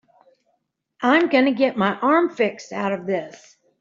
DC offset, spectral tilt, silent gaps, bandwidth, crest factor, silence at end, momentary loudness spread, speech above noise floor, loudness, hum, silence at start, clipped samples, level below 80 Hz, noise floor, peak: under 0.1%; -6 dB/octave; none; 7.6 kHz; 18 dB; 0.5 s; 10 LU; 52 dB; -20 LUFS; none; 1 s; under 0.1%; -68 dBFS; -72 dBFS; -4 dBFS